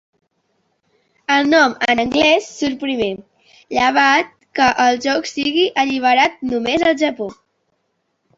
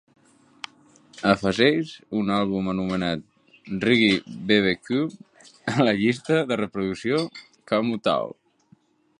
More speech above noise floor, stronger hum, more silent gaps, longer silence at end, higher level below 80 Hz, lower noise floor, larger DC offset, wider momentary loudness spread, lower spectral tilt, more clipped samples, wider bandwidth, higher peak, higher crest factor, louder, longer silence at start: first, 53 dB vs 37 dB; neither; neither; first, 1.05 s vs 0.9 s; about the same, -54 dBFS vs -56 dBFS; first, -69 dBFS vs -60 dBFS; neither; second, 10 LU vs 14 LU; second, -3 dB/octave vs -6 dB/octave; neither; second, 7.8 kHz vs 10.5 kHz; about the same, -2 dBFS vs -2 dBFS; second, 16 dB vs 22 dB; first, -16 LUFS vs -23 LUFS; first, 1.3 s vs 1.15 s